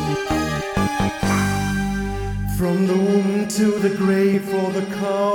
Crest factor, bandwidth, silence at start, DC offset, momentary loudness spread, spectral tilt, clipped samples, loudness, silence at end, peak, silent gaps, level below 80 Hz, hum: 14 dB; 18 kHz; 0 s; under 0.1%; 6 LU; -6 dB/octave; under 0.1%; -20 LUFS; 0 s; -6 dBFS; none; -36 dBFS; none